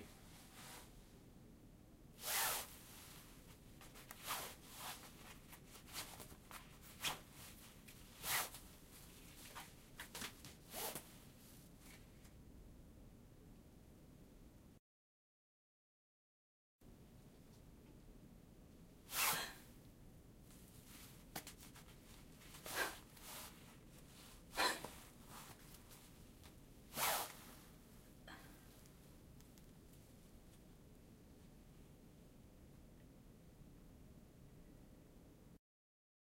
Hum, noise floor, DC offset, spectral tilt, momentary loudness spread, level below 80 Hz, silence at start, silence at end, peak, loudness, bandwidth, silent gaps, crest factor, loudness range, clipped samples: none; under -90 dBFS; under 0.1%; -1.5 dB/octave; 23 LU; -68 dBFS; 0 s; 0.8 s; -24 dBFS; -47 LUFS; 16 kHz; 14.79-16.79 s; 28 dB; 19 LU; under 0.1%